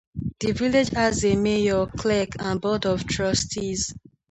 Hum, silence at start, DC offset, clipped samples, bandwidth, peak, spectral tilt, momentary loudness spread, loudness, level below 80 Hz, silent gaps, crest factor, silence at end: none; 0.15 s; under 0.1%; under 0.1%; 9 kHz; -8 dBFS; -4.5 dB/octave; 6 LU; -24 LUFS; -42 dBFS; none; 16 dB; 0.35 s